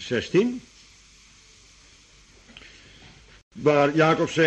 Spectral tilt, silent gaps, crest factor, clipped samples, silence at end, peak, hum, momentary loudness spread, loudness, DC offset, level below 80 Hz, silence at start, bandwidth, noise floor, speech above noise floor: -5.5 dB/octave; 3.43-3.51 s; 20 dB; under 0.1%; 0 s; -6 dBFS; none; 26 LU; -22 LUFS; under 0.1%; -58 dBFS; 0 s; 8.8 kHz; -53 dBFS; 33 dB